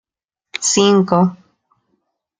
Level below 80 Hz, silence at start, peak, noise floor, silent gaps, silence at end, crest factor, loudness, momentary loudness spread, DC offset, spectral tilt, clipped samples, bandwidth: -62 dBFS; 0.55 s; -2 dBFS; -85 dBFS; none; 1.05 s; 16 dB; -14 LUFS; 8 LU; under 0.1%; -4.5 dB/octave; under 0.1%; 9.6 kHz